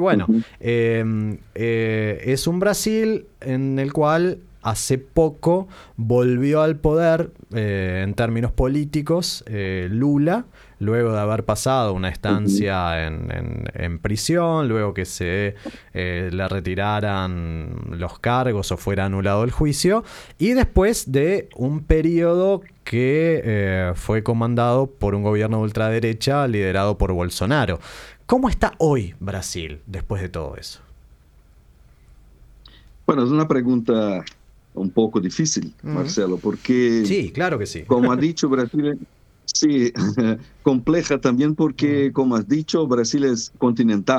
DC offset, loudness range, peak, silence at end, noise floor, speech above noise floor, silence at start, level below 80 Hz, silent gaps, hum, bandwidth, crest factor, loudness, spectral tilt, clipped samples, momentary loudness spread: under 0.1%; 4 LU; -2 dBFS; 0 s; -51 dBFS; 31 dB; 0 s; -36 dBFS; none; none; 15 kHz; 18 dB; -21 LUFS; -6 dB/octave; under 0.1%; 10 LU